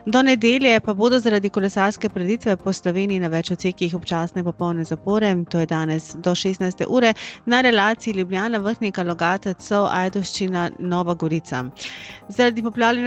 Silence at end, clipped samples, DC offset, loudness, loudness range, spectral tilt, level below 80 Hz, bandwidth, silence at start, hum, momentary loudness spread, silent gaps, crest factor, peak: 0 s; under 0.1%; under 0.1%; -21 LUFS; 3 LU; -5.5 dB/octave; -56 dBFS; 8.8 kHz; 0.05 s; none; 9 LU; none; 16 dB; -4 dBFS